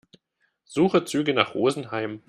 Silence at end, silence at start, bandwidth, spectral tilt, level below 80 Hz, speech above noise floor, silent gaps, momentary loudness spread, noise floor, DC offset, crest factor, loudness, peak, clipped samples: 0.1 s; 0.7 s; 13.5 kHz; -5 dB/octave; -66 dBFS; 49 dB; none; 9 LU; -73 dBFS; under 0.1%; 24 dB; -24 LUFS; 0 dBFS; under 0.1%